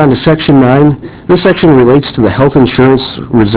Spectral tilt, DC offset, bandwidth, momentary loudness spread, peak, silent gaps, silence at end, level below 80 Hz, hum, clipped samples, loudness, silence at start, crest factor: -11.5 dB/octave; 0.2%; 4 kHz; 6 LU; 0 dBFS; none; 0 s; -30 dBFS; none; 4%; -7 LUFS; 0 s; 6 dB